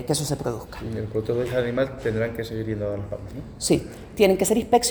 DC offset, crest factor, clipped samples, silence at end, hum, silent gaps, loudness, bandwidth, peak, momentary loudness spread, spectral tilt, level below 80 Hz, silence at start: under 0.1%; 18 dB; under 0.1%; 0 s; none; none; -25 LUFS; over 20 kHz; -6 dBFS; 13 LU; -4.5 dB/octave; -46 dBFS; 0 s